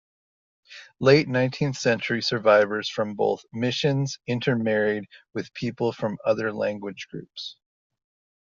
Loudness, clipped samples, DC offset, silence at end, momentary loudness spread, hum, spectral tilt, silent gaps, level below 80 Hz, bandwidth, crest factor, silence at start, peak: -24 LUFS; under 0.1%; under 0.1%; 0.95 s; 17 LU; none; -4.5 dB/octave; none; -64 dBFS; 7.4 kHz; 20 dB; 0.7 s; -4 dBFS